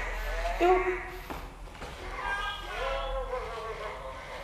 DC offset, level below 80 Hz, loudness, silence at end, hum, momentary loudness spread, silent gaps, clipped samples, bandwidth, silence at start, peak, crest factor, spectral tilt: under 0.1%; -40 dBFS; -32 LUFS; 0 s; none; 16 LU; none; under 0.1%; 15 kHz; 0 s; -12 dBFS; 20 dB; -5 dB/octave